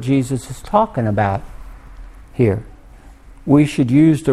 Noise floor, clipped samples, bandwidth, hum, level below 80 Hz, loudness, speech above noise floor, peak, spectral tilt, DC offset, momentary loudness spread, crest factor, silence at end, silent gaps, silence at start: -41 dBFS; under 0.1%; 13.5 kHz; none; -38 dBFS; -17 LUFS; 26 dB; 0 dBFS; -7.5 dB/octave; under 0.1%; 13 LU; 16 dB; 0 s; none; 0 s